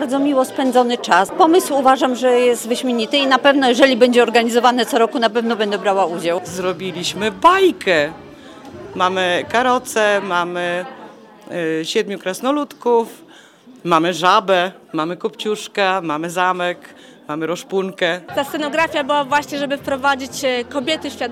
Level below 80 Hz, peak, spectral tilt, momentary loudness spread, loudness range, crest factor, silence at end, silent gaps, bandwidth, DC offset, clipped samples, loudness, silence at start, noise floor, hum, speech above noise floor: -62 dBFS; 0 dBFS; -3.5 dB/octave; 10 LU; 6 LU; 18 dB; 0 s; none; 16 kHz; under 0.1%; under 0.1%; -17 LUFS; 0 s; -44 dBFS; none; 27 dB